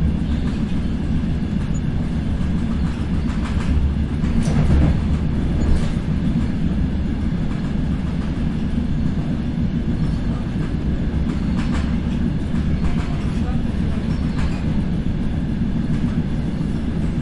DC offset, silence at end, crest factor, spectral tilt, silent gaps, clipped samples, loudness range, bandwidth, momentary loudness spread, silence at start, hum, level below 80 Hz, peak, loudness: under 0.1%; 0 s; 14 dB; -8 dB/octave; none; under 0.1%; 2 LU; 11 kHz; 3 LU; 0 s; none; -24 dBFS; -4 dBFS; -22 LUFS